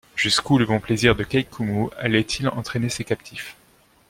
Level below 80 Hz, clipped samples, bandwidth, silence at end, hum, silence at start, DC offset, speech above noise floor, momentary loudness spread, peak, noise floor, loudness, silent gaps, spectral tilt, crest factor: -46 dBFS; under 0.1%; 16.5 kHz; 0.55 s; none; 0.15 s; under 0.1%; 35 dB; 10 LU; -2 dBFS; -57 dBFS; -22 LUFS; none; -4.5 dB/octave; 20 dB